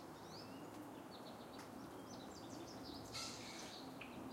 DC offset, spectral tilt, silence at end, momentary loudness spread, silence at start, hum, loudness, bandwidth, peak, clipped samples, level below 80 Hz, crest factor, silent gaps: under 0.1%; -3.5 dB/octave; 0 s; 6 LU; 0 s; none; -52 LUFS; 16 kHz; -36 dBFS; under 0.1%; -74 dBFS; 18 dB; none